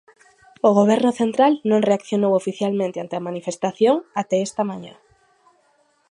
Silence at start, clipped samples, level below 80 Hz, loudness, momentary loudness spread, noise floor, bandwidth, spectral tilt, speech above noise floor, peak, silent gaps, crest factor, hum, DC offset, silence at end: 0.65 s; under 0.1%; -70 dBFS; -20 LUFS; 11 LU; -62 dBFS; 11 kHz; -6 dB/octave; 43 dB; -4 dBFS; none; 18 dB; none; under 0.1%; 1.2 s